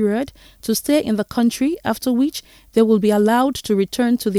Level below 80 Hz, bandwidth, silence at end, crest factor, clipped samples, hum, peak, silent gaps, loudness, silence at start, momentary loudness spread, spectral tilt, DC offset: -50 dBFS; 16.5 kHz; 0 s; 16 dB; under 0.1%; none; -2 dBFS; none; -18 LUFS; 0 s; 8 LU; -5 dB/octave; under 0.1%